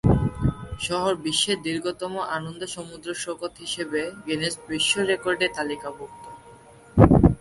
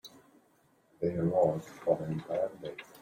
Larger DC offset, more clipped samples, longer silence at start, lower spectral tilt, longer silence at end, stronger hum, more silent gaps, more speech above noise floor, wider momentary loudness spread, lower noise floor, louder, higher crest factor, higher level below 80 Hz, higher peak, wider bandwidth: neither; neither; about the same, 0.05 s vs 0.05 s; second, -5 dB/octave vs -8 dB/octave; about the same, 0.05 s vs 0.05 s; neither; neither; second, 21 dB vs 36 dB; about the same, 14 LU vs 16 LU; second, -48 dBFS vs -68 dBFS; first, -24 LUFS vs -32 LUFS; about the same, 24 dB vs 20 dB; first, -36 dBFS vs -66 dBFS; first, 0 dBFS vs -14 dBFS; second, 11.5 kHz vs 16.5 kHz